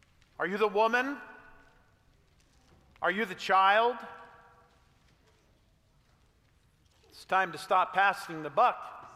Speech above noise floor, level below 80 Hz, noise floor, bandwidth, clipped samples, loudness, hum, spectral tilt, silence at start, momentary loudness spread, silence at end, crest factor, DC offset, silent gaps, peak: 38 dB; -70 dBFS; -66 dBFS; 15.5 kHz; under 0.1%; -28 LUFS; none; -4 dB/octave; 0.4 s; 18 LU; 0.05 s; 20 dB; under 0.1%; none; -12 dBFS